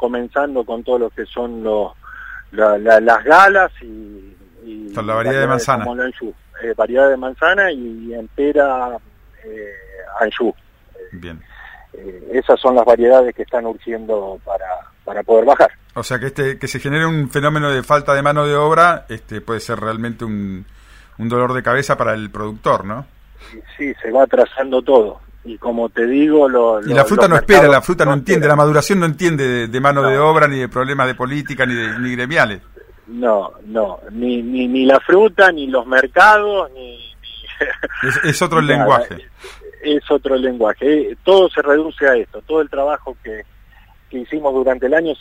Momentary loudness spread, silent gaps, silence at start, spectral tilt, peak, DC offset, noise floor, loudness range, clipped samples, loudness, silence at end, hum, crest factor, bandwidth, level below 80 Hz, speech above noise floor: 19 LU; none; 0 s; -5.5 dB/octave; 0 dBFS; under 0.1%; -45 dBFS; 8 LU; under 0.1%; -15 LUFS; 0.05 s; none; 16 dB; 16 kHz; -42 dBFS; 31 dB